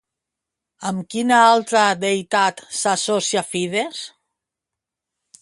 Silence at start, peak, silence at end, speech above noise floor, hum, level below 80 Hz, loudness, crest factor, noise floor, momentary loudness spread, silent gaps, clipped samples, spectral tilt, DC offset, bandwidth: 0.8 s; 0 dBFS; 1.35 s; 66 dB; none; -68 dBFS; -19 LUFS; 20 dB; -85 dBFS; 14 LU; none; under 0.1%; -3 dB/octave; under 0.1%; 11.5 kHz